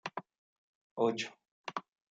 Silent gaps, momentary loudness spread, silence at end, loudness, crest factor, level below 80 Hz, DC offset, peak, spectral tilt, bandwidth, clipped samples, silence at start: 0.38-0.96 s, 1.51-1.64 s; 15 LU; 0.3 s; -38 LUFS; 22 dB; -88 dBFS; under 0.1%; -16 dBFS; -4 dB/octave; 9 kHz; under 0.1%; 0.05 s